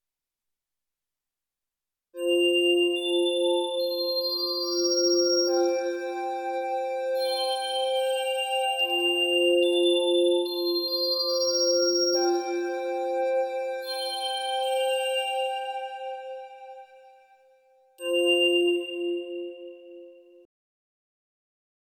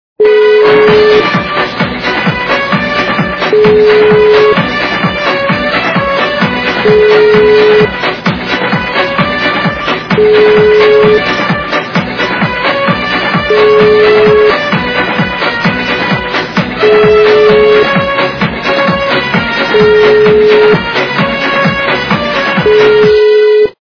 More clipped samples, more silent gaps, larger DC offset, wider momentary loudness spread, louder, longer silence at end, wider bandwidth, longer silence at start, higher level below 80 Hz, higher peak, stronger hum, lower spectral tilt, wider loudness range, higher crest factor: second, under 0.1% vs 1%; neither; neither; first, 12 LU vs 6 LU; second, -25 LUFS vs -8 LUFS; first, 1.85 s vs 0.1 s; first, 18 kHz vs 5.4 kHz; first, 2.15 s vs 0.2 s; second, under -90 dBFS vs -36 dBFS; second, -12 dBFS vs 0 dBFS; neither; second, 0.5 dB/octave vs -6 dB/octave; first, 6 LU vs 1 LU; first, 14 dB vs 8 dB